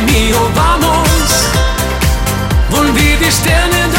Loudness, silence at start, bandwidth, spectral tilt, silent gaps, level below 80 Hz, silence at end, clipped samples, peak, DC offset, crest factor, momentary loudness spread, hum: -11 LUFS; 0 s; 17 kHz; -4 dB/octave; none; -16 dBFS; 0 s; under 0.1%; 0 dBFS; under 0.1%; 10 dB; 4 LU; none